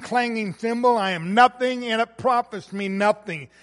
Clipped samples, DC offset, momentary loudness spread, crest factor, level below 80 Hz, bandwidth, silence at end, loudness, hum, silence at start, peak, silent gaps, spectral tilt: under 0.1%; under 0.1%; 11 LU; 20 dB; -66 dBFS; 11.5 kHz; 0.15 s; -22 LUFS; none; 0 s; -4 dBFS; none; -5 dB/octave